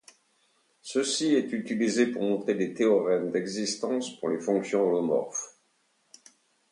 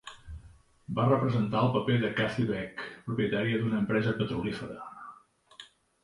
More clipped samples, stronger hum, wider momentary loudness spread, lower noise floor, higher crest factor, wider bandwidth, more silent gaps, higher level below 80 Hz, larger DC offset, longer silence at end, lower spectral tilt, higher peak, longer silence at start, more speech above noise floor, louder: neither; neither; second, 7 LU vs 22 LU; first, -70 dBFS vs -56 dBFS; about the same, 18 dB vs 18 dB; about the same, 11 kHz vs 11 kHz; neither; second, -76 dBFS vs -56 dBFS; neither; first, 1.25 s vs 0.4 s; second, -4 dB/octave vs -7.5 dB/octave; about the same, -12 dBFS vs -12 dBFS; first, 0.85 s vs 0.05 s; first, 44 dB vs 27 dB; about the same, -27 LUFS vs -29 LUFS